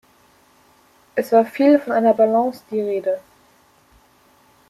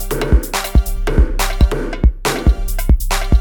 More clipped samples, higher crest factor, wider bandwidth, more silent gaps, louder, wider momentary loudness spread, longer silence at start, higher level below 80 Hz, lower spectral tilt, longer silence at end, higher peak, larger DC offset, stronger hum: neither; about the same, 18 dB vs 14 dB; second, 14.5 kHz vs 19.5 kHz; neither; about the same, -18 LUFS vs -17 LUFS; first, 11 LU vs 1 LU; first, 1.15 s vs 0 s; second, -68 dBFS vs -14 dBFS; first, -6.5 dB/octave vs -5 dB/octave; first, 1.5 s vs 0 s; second, -4 dBFS vs 0 dBFS; neither; neither